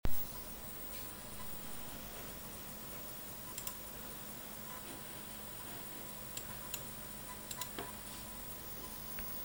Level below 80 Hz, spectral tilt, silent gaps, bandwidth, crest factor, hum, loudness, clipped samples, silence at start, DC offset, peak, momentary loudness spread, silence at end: -54 dBFS; -3 dB/octave; none; over 20 kHz; 22 dB; none; -44 LUFS; under 0.1%; 0.05 s; under 0.1%; -20 dBFS; 3 LU; 0 s